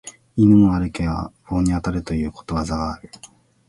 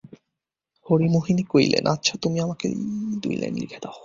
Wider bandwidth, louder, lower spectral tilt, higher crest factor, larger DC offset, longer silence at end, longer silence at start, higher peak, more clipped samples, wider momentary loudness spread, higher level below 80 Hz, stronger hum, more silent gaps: first, 11.5 kHz vs 7.6 kHz; first, -20 LUFS vs -23 LUFS; first, -7.5 dB/octave vs -5.5 dB/octave; about the same, 16 dB vs 20 dB; neither; first, 0.4 s vs 0 s; about the same, 0.05 s vs 0.1 s; about the same, -4 dBFS vs -4 dBFS; neither; first, 15 LU vs 9 LU; first, -36 dBFS vs -58 dBFS; neither; neither